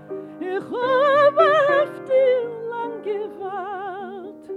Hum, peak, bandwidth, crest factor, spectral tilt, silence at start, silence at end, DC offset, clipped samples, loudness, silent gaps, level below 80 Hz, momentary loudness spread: none; -4 dBFS; 9.6 kHz; 18 dB; -5.5 dB/octave; 0 s; 0 s; under 0.1%; under 0.1%; -20 LUFS; none; -74 dBFS; 16 LU